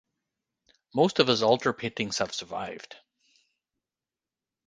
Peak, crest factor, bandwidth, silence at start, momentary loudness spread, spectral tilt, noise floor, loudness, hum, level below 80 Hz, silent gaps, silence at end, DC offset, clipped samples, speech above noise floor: -4 dBFS; 26 dB; 9.8 kHz; 0.95 s; 16 LU; -4 dB/octave; under -90 dBFS; -26 LUFS; none; -66 dBFS; none; 1.75 s; under 0.1%; under 0.1%; over 63 dB